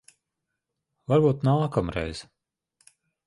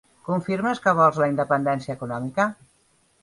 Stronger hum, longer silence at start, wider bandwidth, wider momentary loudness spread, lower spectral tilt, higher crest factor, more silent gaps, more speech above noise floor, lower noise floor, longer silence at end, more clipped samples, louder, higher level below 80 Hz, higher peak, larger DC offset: neither; first, 1.1 s vs 0.25 s; about the same, 11.5 kHz vs 11.5 kHz; first, 17 LU vs 10 LU; about the same, -8 dB/octave vs -7 dB/octave; about the same, 20 dB vs 18 dB; neither; first, 60 dB vs 41 dB; first, -83 dBFS vs -63 dBFS; first, 1.05 s vs 0.7 s; neither; about the same, -25 LUFS vs -23 LUFS; first, -50 dBFS vs -62 dBFS; about the same, -8 dBFS vs -6 dBFS; neither